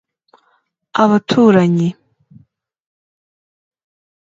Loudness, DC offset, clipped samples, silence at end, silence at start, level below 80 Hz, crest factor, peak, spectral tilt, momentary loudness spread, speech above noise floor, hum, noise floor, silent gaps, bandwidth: -13 LUFS; under 0.1%; under 0.1%; 2.3 s; 0.95 s; -62 dBFS; 18 dB; 0 dBFS; -7.5 dB/octave; 10 LU; 50 dB; none; -62 dBFS; none; 7.8 kHz